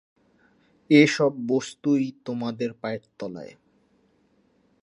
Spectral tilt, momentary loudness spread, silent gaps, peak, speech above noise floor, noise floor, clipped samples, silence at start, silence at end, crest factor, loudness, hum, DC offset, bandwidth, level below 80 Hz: -5.5 dB/octave; 19 LU; none; -4 dBFS; 41 dB; -65 dBFS; under 0.1%; 0.9 s; 1.3 s; 22 dB; -23 LUFS; none; under 0.1%; 10.5 kHz; -72 dBFS